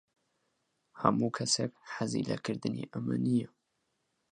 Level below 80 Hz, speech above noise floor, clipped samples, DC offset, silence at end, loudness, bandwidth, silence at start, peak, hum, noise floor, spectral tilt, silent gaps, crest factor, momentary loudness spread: -72 dBFS; 48 dB; under 0.1%; under 0.1%; 0.85 s; -33 LUFS; 11.5 kHz; 0.95 s; -10 dBFS; none; -80 dBFS; -4.5 dB/octave; none; 26 dB; 8 LU